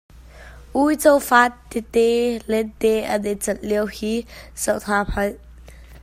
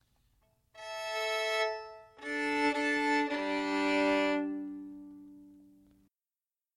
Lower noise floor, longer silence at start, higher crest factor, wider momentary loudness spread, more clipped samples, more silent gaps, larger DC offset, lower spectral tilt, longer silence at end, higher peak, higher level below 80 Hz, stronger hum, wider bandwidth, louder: second, -42 dBFS vs under -90 dBFS; second, 0.15 s vs 0.75 s; about the same, 20 dB vs 16 dB; second, 11 LU vs 19 LU; neither; neither; neither; about the same, -4 dB/octave vs -3 dB/octave; second, 0 s vs 1.15 s; first, 0 dBFS vs -18 dBFS; first, -40 dBFS vs -72 dBFS; neither; first, 16 kHz vs 13 kHz; first, -20 LUFS vs -31 LUFS